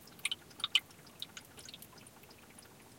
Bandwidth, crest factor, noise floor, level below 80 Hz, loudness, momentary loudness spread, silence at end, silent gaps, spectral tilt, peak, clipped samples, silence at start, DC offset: 17 kHz; 32 dB; -57 dBFS; -76 dBFS; -36 LUFS; 23 LU; 0 s; none; 0 dB/octave; -12 dBFS; under 0.1%; 0 s; under 0.1%